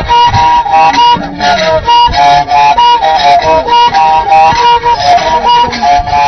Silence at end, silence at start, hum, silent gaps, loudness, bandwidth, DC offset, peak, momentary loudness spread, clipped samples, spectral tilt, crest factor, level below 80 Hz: 0 s; 0 s; none; none; -6 LUFS; 6.4 kHz; under 0.1%; 0 dBFS; 3 LU; 0.4%; -3.5 dB/octave; 6 dB; -28 dBFS